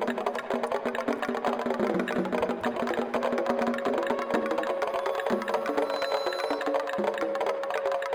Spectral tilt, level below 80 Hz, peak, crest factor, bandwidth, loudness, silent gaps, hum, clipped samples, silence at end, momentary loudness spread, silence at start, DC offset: -5 dB/octave; -64 dBFS; -12 dBFS; 16 dB; 20 kHz; -29 LUFS; none; none; under 0.1%; 0 s; 2 LU; 0 s; under 0.1%